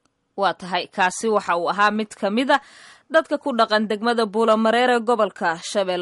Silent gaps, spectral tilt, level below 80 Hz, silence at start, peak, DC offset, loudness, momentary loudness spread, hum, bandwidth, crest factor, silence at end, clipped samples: none; -4 dB/octave; -70 dBFS; 0.35 s; -4 dBFS; under 0.1%; -21 LUFS; 6 LU; none; 11.5 kHz; 16 dB; 0 s; under 0.1%